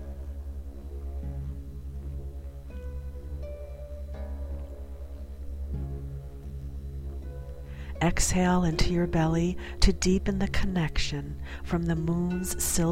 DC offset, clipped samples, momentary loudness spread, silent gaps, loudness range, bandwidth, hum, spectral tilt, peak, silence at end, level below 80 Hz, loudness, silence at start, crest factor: 0.3%; under 0.1%; 16 LU; none; 13 LU; 16.5 kHz; none; -5 dB/octave; -6 dBFS; 0 s; -34 dBFS; -31 LUFS; 0 s; 24 dB